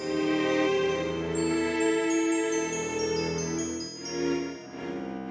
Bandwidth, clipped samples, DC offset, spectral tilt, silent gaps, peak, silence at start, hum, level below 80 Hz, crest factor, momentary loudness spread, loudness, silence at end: 8 kHz; under 0.1%; under 0.1%; -4 dB/octave; none; -14 dBFS; 0 s; none; -54 dBFS; 14 dB; 10 LU; -28 LUFS; 0 s